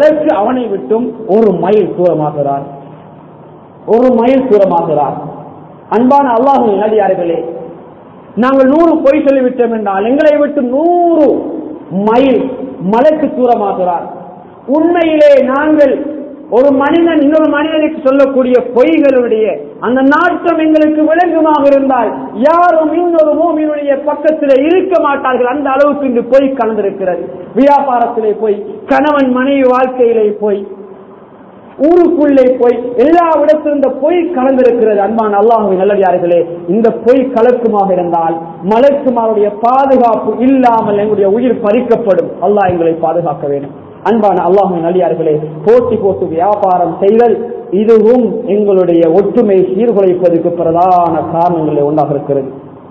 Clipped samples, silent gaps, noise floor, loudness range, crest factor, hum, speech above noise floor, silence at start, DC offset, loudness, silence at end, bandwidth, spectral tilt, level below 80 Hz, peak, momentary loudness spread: 1%; none; -35 dBFS; 3 LU; 10 dB; none; 26 dB; 0 s; under 0.1%; -10 LUFS; 0 s; 8 kHz; -8.5 dB/octave; -48 dBFS; 0 dBFS; 8 LU